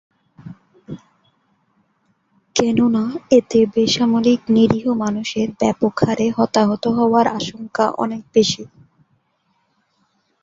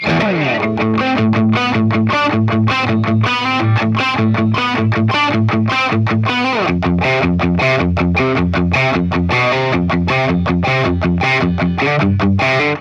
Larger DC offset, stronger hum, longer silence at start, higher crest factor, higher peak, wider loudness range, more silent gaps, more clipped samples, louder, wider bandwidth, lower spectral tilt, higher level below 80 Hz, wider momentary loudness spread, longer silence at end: neither; neither; first, 0.45 s vs 0 s; first, 18 dB vs 10 dB; about the same, -2 dBFS vs -4 dBFS; first, 5 LU vs 0 LU; neither; neither; second, -17 LUFS vs -14 LUFS; about the same, 7.8 kHz vs 7.6 kHz; second, -5 dB/octave vs -7 dB/octave; second, -54 dBFS vs -34 dBFS; first, 10 LU vs 2 LU; first, 1.75 s vs 0 s